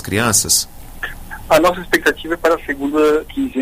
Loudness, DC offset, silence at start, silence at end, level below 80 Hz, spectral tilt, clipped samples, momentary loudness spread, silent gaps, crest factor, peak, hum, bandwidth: -15 LUFS; under 0.1%; 0 s; 0 s; -36 dBFS; -3 dB/octave; under 0.1%; 15 LU; none; 16 dB; -2 dBFS; none; 16 kHz